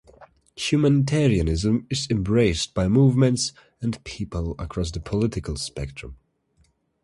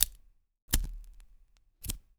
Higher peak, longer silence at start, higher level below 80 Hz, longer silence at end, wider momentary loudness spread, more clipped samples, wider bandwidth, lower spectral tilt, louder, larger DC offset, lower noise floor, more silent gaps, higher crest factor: second, -6 dBFS vs -2 dBFS; first, 0.2 s vs 0 s; about the same, -38 dBFS vs -40 dBFS; first, 0.9 s vs 0.2 s; about the same, 13 LU vs 15 LU; neither; second, 11.5 kHz vs over 20 kHz; first, -6 dB/octave vs -1.5 dB/octave; first, -23 LUFS vs -35 LUFS; neither; about the same, -64 dBFS vs -62 dBFS; second, none vs 0.62-0.68 s; second, 16 dB vs 34 dB